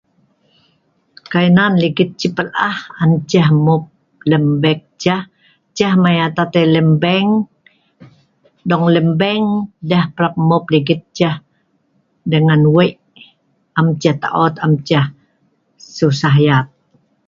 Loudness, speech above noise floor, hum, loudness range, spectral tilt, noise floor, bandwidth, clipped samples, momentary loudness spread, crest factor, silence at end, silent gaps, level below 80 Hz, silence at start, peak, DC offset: -14 LUFS; 48 dB; none; 2 LU; -7 dB/octave; -61 dBFS; 7.2 kHz; under 0.1%; 8 LU; 16 dB; 0.6 s; none; -54 dBFS; 1.3 s; 0 dBFS; under 0.1%